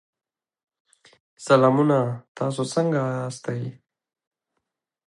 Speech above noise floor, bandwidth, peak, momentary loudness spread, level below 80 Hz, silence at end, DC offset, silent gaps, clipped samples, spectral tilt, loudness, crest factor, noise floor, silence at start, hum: over 68 dB; 11.5 kHz; -4 dBFS; 14 LU; -70 dBFS; 1.35 s; under 0.1%; 2.28-2.35 s; under 0.1%; -6.5 dB/octave; -23 LUFS; 20 dB; under -90 dBFS; 1.4 s; none